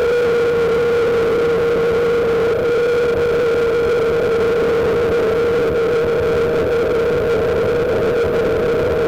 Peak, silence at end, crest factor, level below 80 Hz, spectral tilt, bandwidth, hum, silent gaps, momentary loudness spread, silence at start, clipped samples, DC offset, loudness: -12 dBFS; 0 s; 4 dB; -38 dBFS; -6 dB/octave; 14.5 kHz; none; none; 1 LU; 0 s; under 0.1%; 0.5%; -16 LUFS